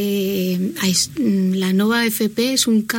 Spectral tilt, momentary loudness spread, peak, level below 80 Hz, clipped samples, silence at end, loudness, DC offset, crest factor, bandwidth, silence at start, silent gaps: -4 dB/octave; 4 LU; -4 dBFS; -56 dBFS; under 0.1%; 0 s; -18 LUFS; under 0.1%; 14 dB; 17 kHz; 0 s; none